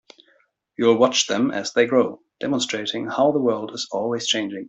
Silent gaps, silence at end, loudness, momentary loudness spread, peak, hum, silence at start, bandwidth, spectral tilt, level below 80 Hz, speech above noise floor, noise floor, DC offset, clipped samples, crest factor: none; 0.05 s; -21 LUFS; 9 LU; -4 dBFS; none; 0.8 s; 8.4 kHz; -3.5 dB/octave; -68 dBFS; 41 dB; -62 dBFS; under 0.1%; under 0.1%; 18 dB